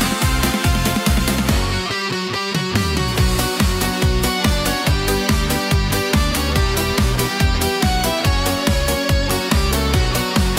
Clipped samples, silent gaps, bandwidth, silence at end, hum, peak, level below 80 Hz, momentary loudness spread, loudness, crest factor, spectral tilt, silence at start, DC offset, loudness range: under 0.1%; none; 16.5 kHz; 0 s; none; -4 dBFS; -24 dBFS; 2 LU; -18 LUFS; 14 dB; -4.5 dB/octave; 0 s; under 0.1%; 1 LU